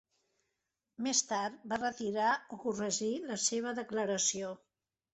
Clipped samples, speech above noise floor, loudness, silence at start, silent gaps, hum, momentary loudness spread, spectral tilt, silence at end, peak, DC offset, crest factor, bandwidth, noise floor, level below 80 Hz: under 0.1%; 52 dB; -34 LUFS; 1 s; none; none; 8 LU; -2 dB/octave; 0.6 s; -16 dBFS; under 0.1%; 20 dB; 8.4 kHz; -86 dBFS; -76 dBFS